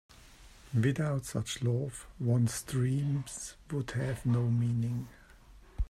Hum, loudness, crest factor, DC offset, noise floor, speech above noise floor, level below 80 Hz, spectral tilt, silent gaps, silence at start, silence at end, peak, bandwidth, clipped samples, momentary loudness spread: none; -33 LUFS; 16 dB; under 0.1%; -56 dBFS; 24 dB; -48 dBFS; -6 dB/octave; none; 0.25 s; 0 s; -18 dBFS; 14 kHz; under 0.1%; 11 LU